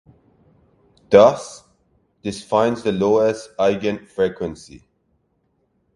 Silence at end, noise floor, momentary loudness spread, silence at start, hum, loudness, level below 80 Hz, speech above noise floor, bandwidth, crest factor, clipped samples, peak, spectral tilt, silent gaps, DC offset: 1.2 s; -67 dBFS; 18 LU; 1.1 s; none; -19 LUFS; -54 dBFS; 49 dB; 11.5 kHz; 20 dB; under 0.1%; 0 dBFS; -5.5 dB/octave; none; under 0.1%